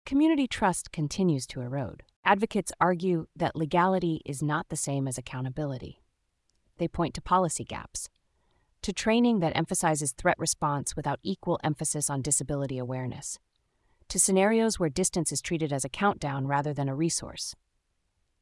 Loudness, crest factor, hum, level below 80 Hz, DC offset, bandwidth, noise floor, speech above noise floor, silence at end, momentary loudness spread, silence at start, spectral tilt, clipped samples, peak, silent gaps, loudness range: -28 LUFS; 22 dB; none; -54 dBFS; under 0.1%; 12 kHz; -76 dBFS; 47 dB; 0.85 s; 11 LU; 0.05 s; -4.5 dB/octave; under 0.1%; -8 dBFS; 2.16-2.23 s; 5 LU